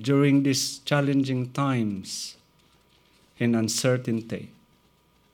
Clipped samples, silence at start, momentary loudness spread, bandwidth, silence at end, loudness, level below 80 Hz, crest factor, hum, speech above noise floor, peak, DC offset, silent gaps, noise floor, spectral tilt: under 0.1%; 0 s; 13 LU; 18 kHz; 0.85 s; -25 LUFS; -68 dBFS; 18 dB; none; 38 dB; -8 dBFS; under 0.1%; none; -63 dBFS; -5 dB/octave